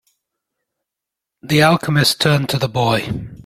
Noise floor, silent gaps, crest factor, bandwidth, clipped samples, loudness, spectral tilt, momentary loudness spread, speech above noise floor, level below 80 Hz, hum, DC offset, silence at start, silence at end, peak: -84 dBFS; none; 18 dB; 16 kHz; under 0.1%; -16 LUFS; -5 dB/octave; 6 LU; 67 dB; -48 dBFS; none; under 0.1%; 1.45 s; 0.05 s; 0 dBFS